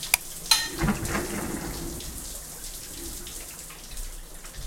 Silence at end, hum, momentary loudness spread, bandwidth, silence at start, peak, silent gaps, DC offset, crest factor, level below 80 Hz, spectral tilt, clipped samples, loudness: 0 s; none; 17 LU; 16.5 kHz; 0 s; -2 dBFS; none; under 0.1%; 30 dB; -40 dBFS; -2 dB/octave; under 0.1%; -29 LUFS